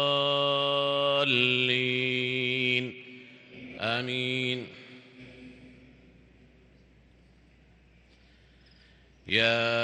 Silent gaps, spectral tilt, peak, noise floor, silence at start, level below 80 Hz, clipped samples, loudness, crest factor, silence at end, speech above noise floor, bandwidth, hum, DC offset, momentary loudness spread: none; -5 dB/octave; -8 dBFS; -59 dBFS; 0 s; -66 dBFS; under 0.1%; -26 LUFS; 22 dB; 0 s; 32 dB; 9.6 kHz; none; under 0.1%; 25 LU